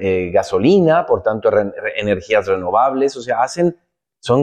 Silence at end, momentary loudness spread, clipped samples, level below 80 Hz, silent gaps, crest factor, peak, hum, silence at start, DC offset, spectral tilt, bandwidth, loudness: 0 s; 7 LU; under 0.1%; -50 dBFS; none; 12 dB; -4 dBFS; none; 0 s; under 0.1%; -6.5 dB/octave; 9.6 kHz; -16 LUFS